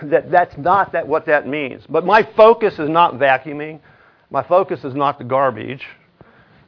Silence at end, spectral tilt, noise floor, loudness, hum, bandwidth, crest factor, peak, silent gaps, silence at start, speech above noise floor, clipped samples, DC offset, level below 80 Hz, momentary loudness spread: 0.75 s; -7.5 dB/octave; -49 dBFS; -16 LUFS; none; 5.4 kHz; 16 dB; 0 dBFS; none; 0 s; 33 dB; under 0.1%; under 0.1%; -56 dBFS; 17 LU